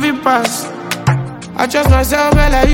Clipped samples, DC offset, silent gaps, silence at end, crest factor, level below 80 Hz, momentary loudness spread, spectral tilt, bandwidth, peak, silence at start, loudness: under 0.1%; under 0.1%; none; 0 s; 12 dB; -20 dBFS; 9 LU; -5 dB/octave; 17 kHz; 0 dBFS; 0 s; -14 LUFS